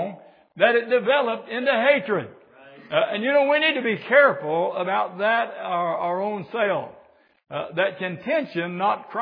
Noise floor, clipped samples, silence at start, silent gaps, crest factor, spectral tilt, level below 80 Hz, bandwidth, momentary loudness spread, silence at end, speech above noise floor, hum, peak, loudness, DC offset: -48 dBFS; under 0.1%; 0 s; none; 20 dB; -8 dB/octave; -78 dBFS; 5 kHz; 10 LU; 0 s; 25 dB; none; -4 dBFS; -22 LUFS; under 0.1%